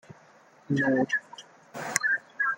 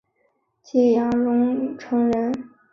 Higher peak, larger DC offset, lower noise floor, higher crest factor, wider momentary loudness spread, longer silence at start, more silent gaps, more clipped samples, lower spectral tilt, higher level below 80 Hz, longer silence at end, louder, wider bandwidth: about the same, -4 dBFS vs -6 dBFS; neither; second, -57 dBFS vs -68 dBFS; first, 26 dB vs 16 dB; first, 20 LU vs 8 LU; second, 0.1 s vs 0.75 s; neither; neither; second, -4 dB/octave vs -7.5 dB/octave; second, -72 dBFS vs -58 dBFS; second, 0 s vs 0.25 s; second, -27 LUFS vs -21 LUFS; first, 17 kHz vs 6.6 kHz